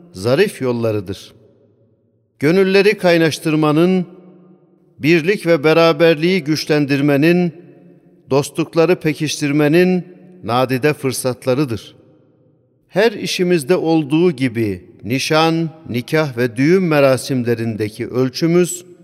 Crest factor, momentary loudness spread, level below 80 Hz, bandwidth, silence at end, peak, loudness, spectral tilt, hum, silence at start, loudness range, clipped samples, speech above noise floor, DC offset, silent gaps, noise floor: 14 dB; 9 LU; -60 dBFS; 15.5 kHz; 0.2 s; -2 dBFS; -16 LUFS; -5.5 dB/octave; none; 0.15 s; 3 LU; under 0.1%; 44 dB; under 0.1%; none; -59 dBFS